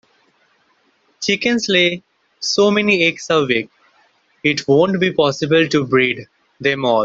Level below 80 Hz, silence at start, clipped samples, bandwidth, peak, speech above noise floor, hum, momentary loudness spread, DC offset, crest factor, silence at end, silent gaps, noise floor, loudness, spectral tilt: -58 dBFS; 1.2 s; under 0.1%; 7.8 kHz; 0 dBFS; 44 dB; none; 8 LU; under 0.1%; 16 dB; 0 s; none; -60 dBFS; -16 LUFS; -4.5 dB/octave